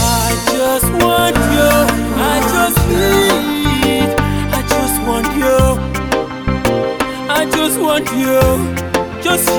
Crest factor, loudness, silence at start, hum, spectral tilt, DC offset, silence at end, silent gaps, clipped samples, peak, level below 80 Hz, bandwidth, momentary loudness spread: 14 dB; -14 LUFS; 0 s; none; -4.5 dB/octave; under 0.1%; 0 s; none; under 0.1%; 0 dBFS; -26 dBFS; 19.5 kHz; 6 LU